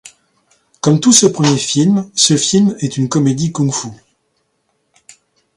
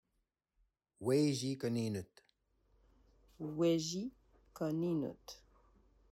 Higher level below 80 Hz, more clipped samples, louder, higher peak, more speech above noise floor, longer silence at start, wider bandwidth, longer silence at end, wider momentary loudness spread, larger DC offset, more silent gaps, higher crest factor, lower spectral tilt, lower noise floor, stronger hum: first, -54 dBFS vs -72 dBFS; neither; first, -13 LUFS vs -37 LUFS; first, 0 dBFS vs -20 dBFS; first, 52 dB vs 48 dB; second, 0.05 s vs 1 s; second, 14.5 kHz vs 16 kHz; first, 1.6 s vs 0.75 s; second, 9 LU vs 18 LU; neither; neither; about the same, 16 dB vs 18 dB; second, -4.5 dB/octave vs -6 dB/octave; second, -65 dBFS vs -84 dBFS; neither